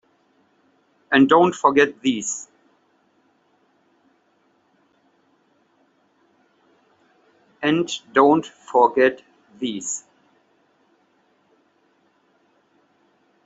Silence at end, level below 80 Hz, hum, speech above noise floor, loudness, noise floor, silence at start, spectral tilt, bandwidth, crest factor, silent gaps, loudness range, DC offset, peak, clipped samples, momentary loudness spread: 3.45 s; -68 dBFS; none; 45 dB; -19 LUFS; -63 dBFS; 1.1 s; -4 dB/octave; 8 kHz; 22 dB; none; 14 LU; under 0.1%; -2 dBFS; under 0.1%; 15 LU